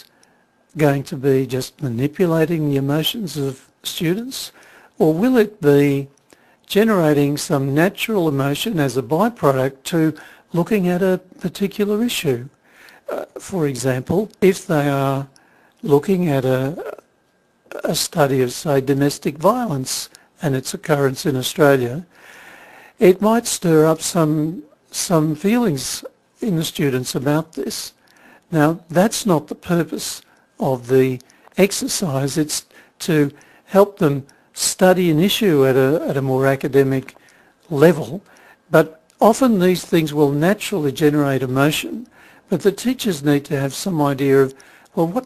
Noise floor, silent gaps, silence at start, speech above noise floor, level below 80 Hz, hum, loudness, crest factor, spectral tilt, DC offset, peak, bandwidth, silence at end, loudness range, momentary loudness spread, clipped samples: -61 dBFS; none; 0.75 s; 43 dB; -54 dBFS; none; -18 LUFS; 18 dB; -5.5 dB/octave; under 0.1%; 0 dBFS; 14 kHz; 0 s; 4 LU; 12 LU; under 0.1%